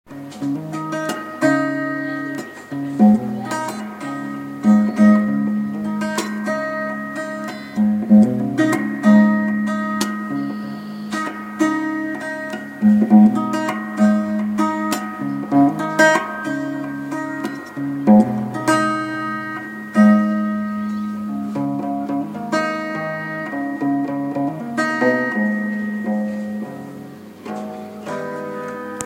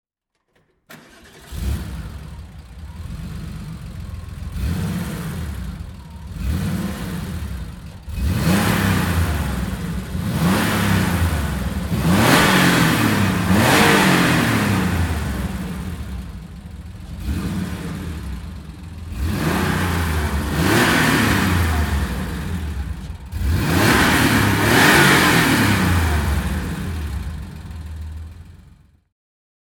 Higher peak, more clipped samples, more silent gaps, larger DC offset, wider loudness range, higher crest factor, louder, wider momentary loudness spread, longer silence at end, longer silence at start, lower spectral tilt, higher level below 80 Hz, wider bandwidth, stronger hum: about the same, 0 dBFS vs 0 dBFS; neither; neither; neither; second, 6 LU vs 15 LU; about the same, 18 dB vs 20 dB; about the same, -19 LUFS vs -18 LUFS; second, 14 LU vs 21 LU; second, 0 s vs 1.15 s; second, 0.1 s vs 0.9 s; first, -6.5 dB/octave vs -4.5 dB/octave; second, -62 dBFS vs -30 dBFS; second, 15.5 kHz vs 19.5 kHz; neither